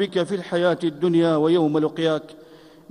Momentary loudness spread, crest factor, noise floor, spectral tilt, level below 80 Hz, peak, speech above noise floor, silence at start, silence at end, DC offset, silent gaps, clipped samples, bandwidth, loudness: 6 LU; 14 dB; -46 dBFS; -7 dB/octave; -66 dBFS; -8 dBFS; 26 dB; 0 s; 0.5 s; under 0.1%; none; under 0.1%; 10.5 kHz; -21 LUFS